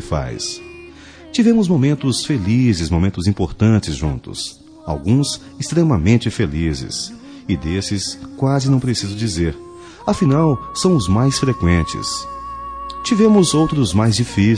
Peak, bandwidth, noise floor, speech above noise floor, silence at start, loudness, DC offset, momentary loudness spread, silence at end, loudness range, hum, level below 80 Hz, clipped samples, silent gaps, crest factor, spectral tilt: -2 dBFS; 10.5 kHz; -39 dBFS; 23 dB; 0 s; -17 LUFS; under 0.1%; 13 LU; 0 s; 3 LU; none; -34 dBFS; under 0.1%; none; 16 dB; -6 dB/octave